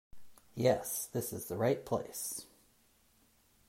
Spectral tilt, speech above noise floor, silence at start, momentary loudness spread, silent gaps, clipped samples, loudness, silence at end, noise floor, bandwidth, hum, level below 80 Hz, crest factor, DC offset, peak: -4.5 dB/octave; 34 dB; 0.15 s; 9 LU; none; under 0.1%; -35 LUFS; 1.25 s; -69 dBFS; 16 kHz; none; -68 dBFS; 22 dB; under 0.1%; -16 dBFS